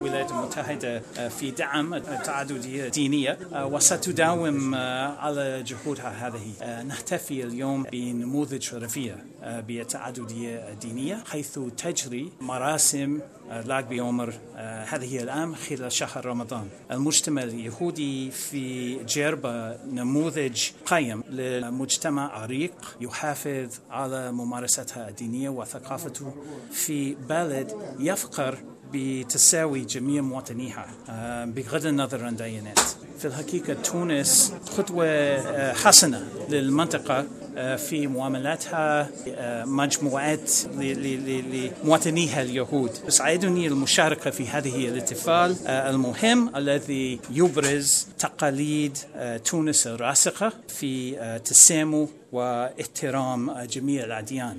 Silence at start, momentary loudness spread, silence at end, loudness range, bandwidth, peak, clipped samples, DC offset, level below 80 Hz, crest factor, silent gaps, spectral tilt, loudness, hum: 0 s; 14 LU; 0 s; 11 LU; 14.5 kHz; 0 dBFS; under 0.1%; under 0.1%; -66 dBFS; 26 dB; none; -3 dB/octave; -25 LUFS; none